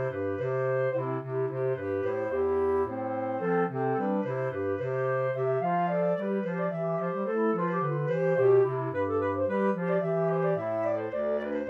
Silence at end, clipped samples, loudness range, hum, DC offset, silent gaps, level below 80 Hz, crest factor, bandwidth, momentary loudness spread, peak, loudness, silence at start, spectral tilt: 0 s; under 0.1%; 2 LU; 50 Hz at -65 dBFS; under 0.1%; none; -64 dBFS; 14 dB; 4.7 kHz; 4 LU; -14 dBFS; -29 LUFS; 0 s; -9.5 dB/octave